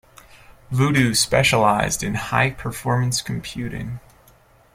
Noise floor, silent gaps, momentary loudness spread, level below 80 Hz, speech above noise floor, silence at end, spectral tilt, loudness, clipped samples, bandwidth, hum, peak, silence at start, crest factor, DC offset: -53 dBFS; none; 13 LU; -44 dBFS; 33 dB; 0.75 s; -4 dB/octave; -20 LUFS; under 0.1%; 16 kHz; none; -2 dBFS; 0.5 s; 18 dB; under 0.1%